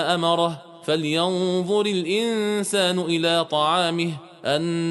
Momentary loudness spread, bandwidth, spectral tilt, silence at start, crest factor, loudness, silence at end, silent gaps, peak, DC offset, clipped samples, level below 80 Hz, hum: 6 LU; 11.5 kHz; -4.5 dB/octave; 0 s; 16 dB; -22 LUFS; 0 s; none; -6 dBFS; under 0.1%; under 0.1%; -68 dBFS; none